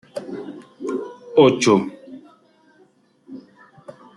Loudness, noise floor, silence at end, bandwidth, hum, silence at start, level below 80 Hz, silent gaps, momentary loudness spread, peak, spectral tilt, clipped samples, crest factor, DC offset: -19 LUFS; -57 dBFS; 0.25 s; 11.5 kHz; none; 0.15 s; -66 dBFS; none; 27 LU; -2 dBFS; -5 dB/octave; under 0.1%; 22 dB; under 0.1%